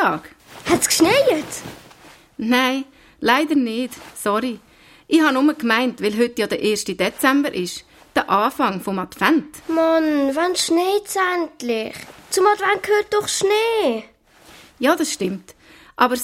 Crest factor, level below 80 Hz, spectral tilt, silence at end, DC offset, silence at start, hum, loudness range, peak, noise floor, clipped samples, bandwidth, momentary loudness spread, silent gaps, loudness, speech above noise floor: 18 dB; -56 dBFS; -3 dB/octave; 0 s; under 0.1%; 0 s; none; 2 LU; -2 dBFS; -48 dBFS; under 0.1%; 16.5 kHz; 13 LU; none; -19 LUFS; 28 dB